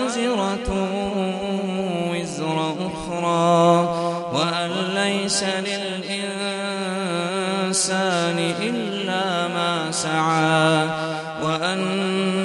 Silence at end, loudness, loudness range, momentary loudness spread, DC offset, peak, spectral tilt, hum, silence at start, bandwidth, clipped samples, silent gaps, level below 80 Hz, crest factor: 0 s; -22 LUFS; 3 LU; 8 LU; under 0.1%; -2 dBFS; -4 dB/octave; none; 0 s; 11.5 kHz; under 0.1%; none; -48 dBFS; 18 dB